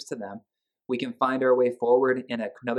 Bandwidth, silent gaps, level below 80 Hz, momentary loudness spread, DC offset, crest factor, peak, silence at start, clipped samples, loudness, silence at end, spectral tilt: 11 kHz; none; -82 dBFS; 14 LU; under 0.1%; 16 dB; -10 dBFS; 0 s; under 0.1%; -25 LUFS; 0 s; -6 dB/octave